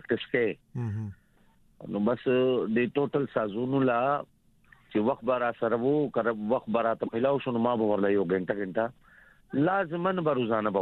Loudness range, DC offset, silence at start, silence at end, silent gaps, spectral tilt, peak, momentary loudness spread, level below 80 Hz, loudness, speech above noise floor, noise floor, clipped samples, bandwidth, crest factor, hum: 2 LU; under 0.1%; 0.1 s; 0 s; none; -9.5 dB/octave; -12 dBFS; 9 LU; -66 dBFS; -28 LUFS; 35 dB; -62 dBFS; under 0.1%; 4.3 kHz; 16 dB; none